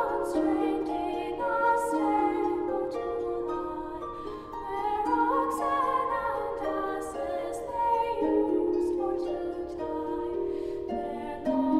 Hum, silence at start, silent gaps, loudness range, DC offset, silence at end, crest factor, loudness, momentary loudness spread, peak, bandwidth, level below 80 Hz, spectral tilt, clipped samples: none; 0 s; none; 2 LU; under 0.1%; 0 s; 14 dB; -29 LUFS; 9 LU; -14 dBFS; 14 kHz; -54 dBFS; -6 dB/octave; under 0.1%